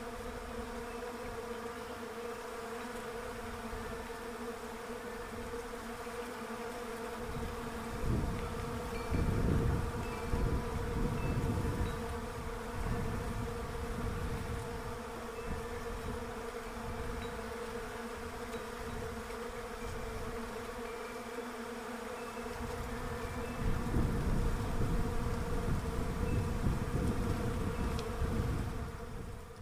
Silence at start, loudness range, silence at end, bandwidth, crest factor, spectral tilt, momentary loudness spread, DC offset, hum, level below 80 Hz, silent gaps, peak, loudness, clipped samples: 0 s; 6 LU; 0 s; 16 kHz; 20 dB; -6 dB/octave; 8 LU; under 0.1%; none; -42 dBFS; none; -18 dBFS; -39 LUFS; under 0.1%